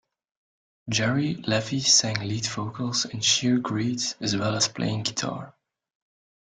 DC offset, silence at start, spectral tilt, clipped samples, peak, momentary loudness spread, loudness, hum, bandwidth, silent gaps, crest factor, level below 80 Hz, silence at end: under 0.1%; 0.85 s; -3 dB/octave; under 0.1%; -6 dBFS; 11 LU; -24 LUFS; none; 11 kHz; none; 20 dB; -62 dBFS; 0.95 s